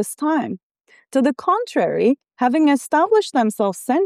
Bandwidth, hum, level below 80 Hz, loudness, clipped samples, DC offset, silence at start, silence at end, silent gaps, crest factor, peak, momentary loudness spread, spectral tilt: 15 kHz; none; -74 dBFS; -19 LUFS; under 0.1%; under 0.1%; 0 s; 0 s; 0.63-0.75 s; 12 dB; -6 dBFS; 6 LU; -5 dB/octave